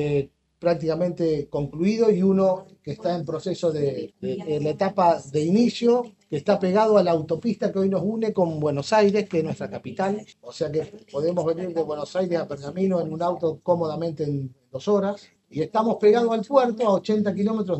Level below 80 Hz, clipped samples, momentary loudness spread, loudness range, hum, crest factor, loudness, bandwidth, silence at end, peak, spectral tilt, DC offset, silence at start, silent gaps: -62 dBFS; under 0.1%; 11 LU; 5 LU; none; 18 dB; -23 LUFS; 8.4 kHz; 0 s; -4 dBFS; -7 dB/octave; under 0.1%; 0 s; none